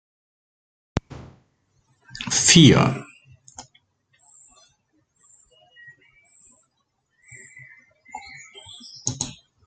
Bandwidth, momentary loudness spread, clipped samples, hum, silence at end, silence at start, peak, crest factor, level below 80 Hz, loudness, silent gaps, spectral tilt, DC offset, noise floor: 9.4 kHz; 31 LU; under 0.1%; none; 0.35 s; 0.95 s; -2 dBFS; 24 dB; -52 dBFS; -18 LUFS; none; -3.5 dB/octave; under 0.1%; -73 dBFS